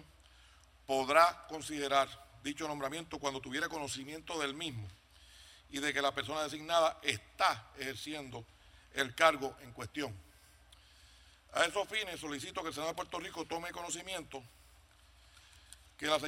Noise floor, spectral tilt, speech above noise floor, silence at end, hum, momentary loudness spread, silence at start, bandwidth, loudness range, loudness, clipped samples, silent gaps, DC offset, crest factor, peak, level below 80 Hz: -63 dBFS; -3 dB/octave; 27 dB; 0 s; none; 19 LU; 0 s; 16 kHz; 6 LU; -35 LUFS; under 0.1%; none; under 0.1%; 26 dB; -10 dBFS; -66 dBFS